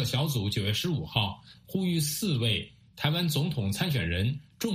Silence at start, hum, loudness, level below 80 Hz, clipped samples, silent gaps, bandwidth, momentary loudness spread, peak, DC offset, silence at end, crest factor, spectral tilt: 0 s; none; -29 LUFS; -52 dBFS; under 0.1%; none; 15.5 kHz; 6 LU; -10 dBFS; under 0.1%; 0 s; 20 dB; -4.5 dB/octave